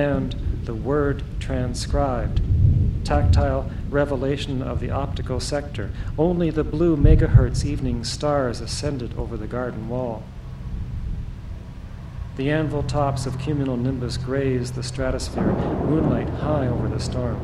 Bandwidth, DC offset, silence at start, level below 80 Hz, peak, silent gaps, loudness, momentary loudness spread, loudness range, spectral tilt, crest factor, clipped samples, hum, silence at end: 12 kHz; under 0.1%; 0 s; -28 dBFS; -2 dBFS; none; -23 LUFS; 12 LU; 8 LU; -7 dB/octave; 20 dB; under 0.1%; none; 0 s